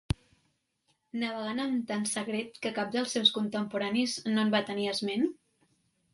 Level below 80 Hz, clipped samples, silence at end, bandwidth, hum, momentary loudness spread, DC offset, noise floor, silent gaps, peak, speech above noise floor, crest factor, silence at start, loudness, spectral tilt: -56 dBFS; under 0.1%; 0.8 s; 11.5 kHz; none; 10 LU; under 0.1%; -75 dBFS; none; -10 dBFS; 45 dB; 22 dB; 0.1 s; -30 LUFS; -4 dB/octave